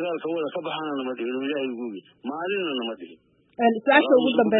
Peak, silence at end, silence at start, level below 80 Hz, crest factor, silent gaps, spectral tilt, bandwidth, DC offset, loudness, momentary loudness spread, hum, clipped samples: -4 dBFS; 0 s; 0 s; -76 dBFS; 20 dB; none; -9.5 dB/octave; 4.1 kHz; under 0.1%; -24 LUFS; 17 LU; none; under 0.1%